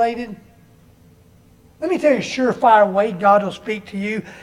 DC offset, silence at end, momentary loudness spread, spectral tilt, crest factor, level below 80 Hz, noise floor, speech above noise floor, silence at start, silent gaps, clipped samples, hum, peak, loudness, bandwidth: under 0.1%; 0 s; 14 LU; -5.5 dB/octave; 18 dB; -56 dBFS; -50 dBFS; 33 dB; 0 s; none; under 0.1%; none; -2 dBFS; -18 LUFS; 12 kHz